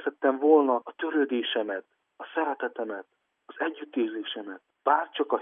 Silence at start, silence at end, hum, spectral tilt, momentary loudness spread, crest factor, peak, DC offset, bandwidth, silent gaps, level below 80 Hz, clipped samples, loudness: 0 s; 0 s; none; -7 dB/octave; 15 LU; 20 dB; -8 dBFS; under 0.1%; 3.8 kHz; none; under -90 dBFS; under 0.1%; -28 LUFS